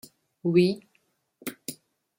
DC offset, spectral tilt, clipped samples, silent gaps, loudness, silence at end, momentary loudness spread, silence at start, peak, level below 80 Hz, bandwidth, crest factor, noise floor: under 0.1%; -6.5 dB/octave; under 0.1%; none; -26 LUFS; 0.45 s; 18 LU; 0.45 s; -8 dBFS; -72 dBFS; 16.5 kHz; 20 dB; -71 dBFS